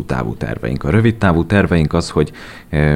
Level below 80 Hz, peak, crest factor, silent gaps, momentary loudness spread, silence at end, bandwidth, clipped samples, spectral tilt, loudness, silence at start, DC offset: -30 dBFS; -2 dBFS; 14 dB; none; 9 LU; 0 s; 11.5 kHz; under 0.1%; -7.5 dB/octave; -16 LUFS; 0 s; under 0.1%